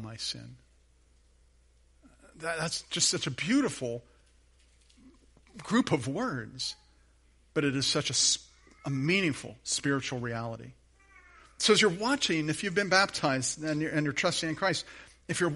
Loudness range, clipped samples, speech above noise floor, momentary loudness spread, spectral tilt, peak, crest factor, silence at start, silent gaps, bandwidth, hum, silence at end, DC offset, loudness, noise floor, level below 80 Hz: 7 LU; under 0.1%; 34 dB; 13 LU; -3 dB/octave; -10 dBFS; 22 dB; 0 s; none; 11.5 kHz; none; 0 s; under 0.1%; -29 LUFS; -63 dBFS; -62 dBFS